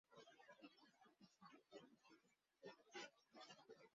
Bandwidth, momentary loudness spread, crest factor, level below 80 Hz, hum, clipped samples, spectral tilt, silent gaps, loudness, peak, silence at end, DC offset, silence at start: 7.4 kHz; 9 LU; 22 dB; under -90 dBFS; none; under 0.1%; -1.5 dB/octave; none; -64 LUFS; -44 dBFS; 0 s; under 0.1%; 0.1 s